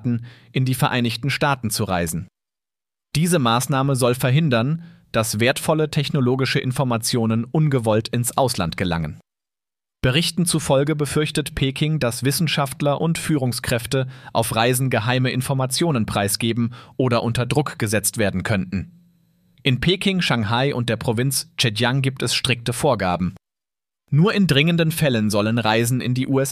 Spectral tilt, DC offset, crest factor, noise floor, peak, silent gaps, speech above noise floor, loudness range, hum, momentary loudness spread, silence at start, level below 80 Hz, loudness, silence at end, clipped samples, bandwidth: -5 dB/octave; under 0.1%; 18 dB; under -90 dBFS; -2 dBFS; none; over 70 dB; 2 LU; none; 6 LU; 0 s; -46 dBFS; -20 LUFS; 0 s; under 0.1%; 15.5 kHz